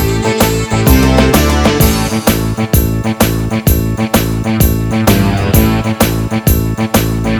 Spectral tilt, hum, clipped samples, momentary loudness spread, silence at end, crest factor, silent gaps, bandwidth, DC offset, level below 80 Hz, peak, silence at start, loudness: -5.5 dB/octave; none; 0.1%; 4 LU; 0 s; 10 dB; none; over 20 kHz; under 0.1%; -18 dBFS; 0 dBFS; 0 s; -12 LUFS